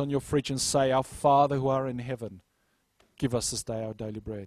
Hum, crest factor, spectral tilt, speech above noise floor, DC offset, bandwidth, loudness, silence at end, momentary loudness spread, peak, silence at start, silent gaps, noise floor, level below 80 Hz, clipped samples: none; 18 dB; -5 dB/octave; 45 dB; under 0.1%; 15 kHz; -28 LUFS; 0 s; 14 LU; -10 dBFS; 0 s; none; -73 dBFS; -54 dBFS; under 0.1%